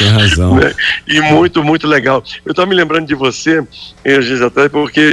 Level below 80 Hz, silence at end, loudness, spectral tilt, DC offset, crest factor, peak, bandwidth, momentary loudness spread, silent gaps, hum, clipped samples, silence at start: -32 dBFS; 0 s; -11 LUFS; -5 dB/octave; under 0.1%; 10 dB; -2 dBFS; 11.5 kHz; 6 LU; none; none; under 0.1%; 0 s